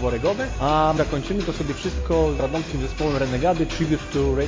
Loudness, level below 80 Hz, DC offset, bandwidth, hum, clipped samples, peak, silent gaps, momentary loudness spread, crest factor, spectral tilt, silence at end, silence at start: -23 LUFS; -32 dBFS; under 0.1%; 7.6 kHz; none; under 0.1%; -8 dBFS; none; 6 LU; 14 dB; -6 dB/octave; 0 s; 0 s